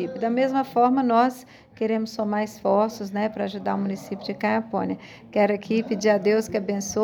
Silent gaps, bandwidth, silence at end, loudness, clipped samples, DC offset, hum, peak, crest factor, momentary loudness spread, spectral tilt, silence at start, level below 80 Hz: none; over 20 kHz; 0 s; -24 LUFS; under 0.1%; under 0.1%; none; -8 dBFS; 16 dB; 9 LU; -5.5 dB/octave; 0 s; -64 dBFS